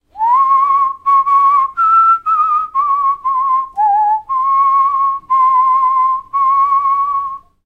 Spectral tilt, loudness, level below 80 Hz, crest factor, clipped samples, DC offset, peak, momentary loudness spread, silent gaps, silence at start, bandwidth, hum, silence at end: -3 dB/octave; -12 LUFS; -54 dBFS; 10 dB; under 0.1%; under 0.1%; -4 dBFS; 5 LU; none; 0.15 s; 4.7 kHz; none; 0.3 s